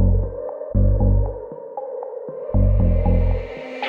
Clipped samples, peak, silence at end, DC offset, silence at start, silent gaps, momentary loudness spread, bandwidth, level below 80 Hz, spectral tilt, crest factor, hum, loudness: under 0.1%; -6 dBFS; 0 s; under 0.1%; 0 s; none; 13 LU; 4.1 kHz; -22 dBFS; -10.5 dB/octave; 14 dB; none; -22 LUFS